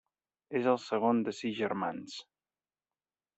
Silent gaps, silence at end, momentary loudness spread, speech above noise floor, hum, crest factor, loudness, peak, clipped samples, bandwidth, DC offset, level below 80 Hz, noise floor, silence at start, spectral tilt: none; 1.15 s; 14 LU; over 58 dB; none; 20 dB; -32 LUFS; -14 dBFS; under 0.1%; 8.2 kHz; under 0.1%; -80 dBFS; under -90 dBFS; 0.5 s; -5.5 dB/octave